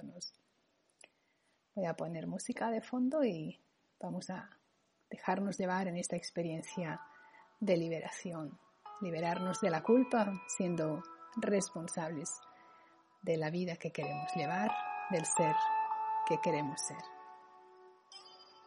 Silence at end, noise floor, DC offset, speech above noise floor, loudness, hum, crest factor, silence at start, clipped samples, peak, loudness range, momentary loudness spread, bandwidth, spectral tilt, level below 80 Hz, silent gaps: 0.05 s; -77 dBFS; under 0.1%; 41 dB; -37 LUFS; none; 20 dB; 0 s; under 0.1%; -18 dBFS; 5 LU; 16 LU; 11.5 kHz; -5 dB/octave; -82 dBFS; none